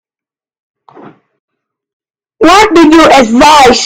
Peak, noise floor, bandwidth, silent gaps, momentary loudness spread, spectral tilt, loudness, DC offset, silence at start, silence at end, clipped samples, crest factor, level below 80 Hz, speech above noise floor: 0 dBFS; -90 dBFS; 18 kHz; none; 3 LU; -3 dB/octave; -4 LUFS; under 0.1%; 2.4 s; 0 s; 5%; 8 dB; -34 dBFS; 86 dB